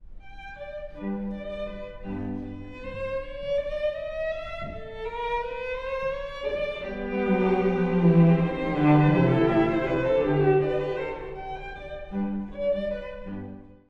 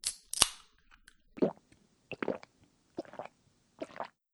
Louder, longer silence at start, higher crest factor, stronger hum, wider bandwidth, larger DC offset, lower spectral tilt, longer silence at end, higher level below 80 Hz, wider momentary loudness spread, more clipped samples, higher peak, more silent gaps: first, -26 LUFS vs -34 LUFS; about the same, 0 s vs 0.05 s; second, 18 dB vs 38 dB; neither; second, 6 kHz vs over 20 kHz; neither; first, -9.5 dB/octave vs -2 dB/octave; about the same, 0.15 s vs 0.25 s; first, -44 dBFS vs -62 dBFS; second, 17 LU vs 21 LU; neither; second, -8 dBFS vs -2 dBFS; neither